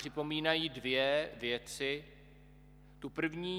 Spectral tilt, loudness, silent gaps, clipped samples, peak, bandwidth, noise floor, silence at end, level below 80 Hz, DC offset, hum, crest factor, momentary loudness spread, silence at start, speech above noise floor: -4 dB/octave; -35 LUFS; none; under 0.1%; -16 dBFS; 19 kHz; -58 dBFS; 0 s; -62 dBFS; under 0.1%; 50 Hz at -60 dBFS; 22 dB; 9 LU; 0 s; 23 dB